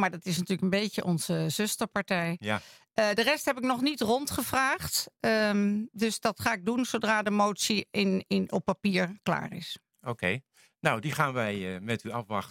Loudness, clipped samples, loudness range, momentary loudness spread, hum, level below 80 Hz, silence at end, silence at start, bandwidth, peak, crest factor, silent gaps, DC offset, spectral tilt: -29 LUFS; under 0.1%; 3 LU; 8 LU; none; -64 dBFS; 0 s; 0 s; 17 kHz; -6 dBFS; 24 dB; none; under 0.1%; -4.5 dB/octave